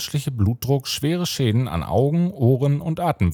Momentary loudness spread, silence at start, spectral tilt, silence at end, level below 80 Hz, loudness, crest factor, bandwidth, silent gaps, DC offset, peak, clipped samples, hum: 4 LU; 0 s; -6.5 dB/octave; 0 s; -46 dBFS; -21 LUFS; 16 dB; 17 kHz; none; under 0.1%; -4 dBFS; under 0.1%; none